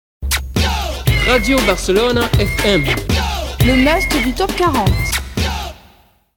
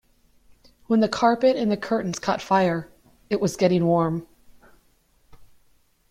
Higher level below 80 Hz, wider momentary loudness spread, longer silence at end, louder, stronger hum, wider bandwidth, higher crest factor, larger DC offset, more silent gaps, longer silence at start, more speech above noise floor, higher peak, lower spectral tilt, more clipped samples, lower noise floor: first, -24 dBFS vs -58 dBFS; about the same, 7 LU vs 7 LU; about the same, 0.6 s vs 0.65 s; first, -15 LUFS vs -22 LUFS; neither; first, 19 kHz vs 15 kHz; about the same, 16 dB vs 18 dB; neither; neither; second, 0.2 s vs 0.9 s; second, 36 dB vs 41 dB; first, 0 dBFS vs -6 dBFS; second, -4.5 dB/octave vs -6 dB/octave; neither; second, -50 dBFS vs -62 dBFS